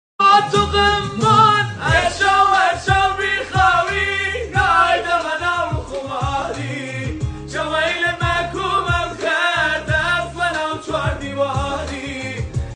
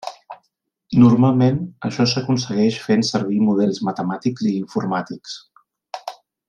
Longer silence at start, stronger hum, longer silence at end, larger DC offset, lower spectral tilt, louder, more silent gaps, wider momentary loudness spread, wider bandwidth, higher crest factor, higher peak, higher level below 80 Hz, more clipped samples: first, 0.2 s vs 0.05 s; neither; second, 0 s vs 0.35 s; neither; second, -4.5 dB/octave vs -6.5 dB/octave; about the same, -17 LUFS vs -19 LUFS; neither; second, 12 LU vs 19 LU; first, 10.5 kHz vs 9.2 kHz; about the same, 16 dB vs 18 dB; about the same, -2 dBFS vs -2 dBFS; first, -34 dBFS vs -58 dBFS; neither